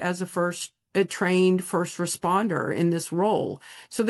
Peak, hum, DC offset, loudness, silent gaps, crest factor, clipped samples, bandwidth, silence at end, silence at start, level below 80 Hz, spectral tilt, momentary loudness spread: -10 dBFS; none; under 0.1%; -25 LUFS; none; 14 dB; under 0.1%; 12.5 kHz; 0 s; 0 s; -70 dBFS; -5 dB/octave; 9 LU